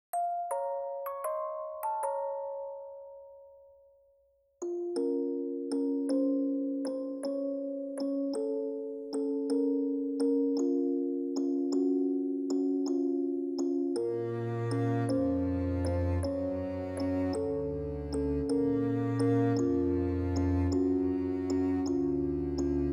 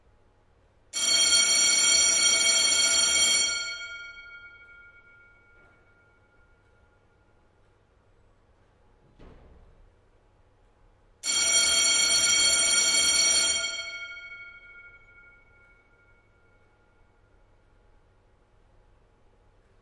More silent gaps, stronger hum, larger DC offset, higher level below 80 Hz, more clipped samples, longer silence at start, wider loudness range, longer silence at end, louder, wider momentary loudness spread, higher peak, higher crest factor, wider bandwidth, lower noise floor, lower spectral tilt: neither; neither; neither; first, -50 dBFS vs -60 dBFS; neither; second, 0.15 s vs 0.95 s; second, 8 LU vs 15 LU; second, 0 s vs 4.95 s; second, -32 LUFS vs -20 LUFS; second, 7 LU vs 21 LU; second, -18 dBFS vs -8 dBFS; second, 14 dB vs 20 dB; first, 13.5 kHz vs 11.5 kHz; first, -69 dBFS vs -63 dBFS; first, -8 dB/octave vs 2.5 dB/octave